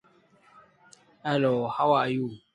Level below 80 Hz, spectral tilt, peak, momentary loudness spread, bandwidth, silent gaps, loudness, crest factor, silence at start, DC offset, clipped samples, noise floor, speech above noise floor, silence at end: -70 dBFS; -7 dB/octave; -10 dBFS; 8 LU; 11 kHz; none; -26 LUFS; 18 dB; 1.25 s; under 0.1%; under 0.1%; -61 dBFS; 35 dB; 0.15 s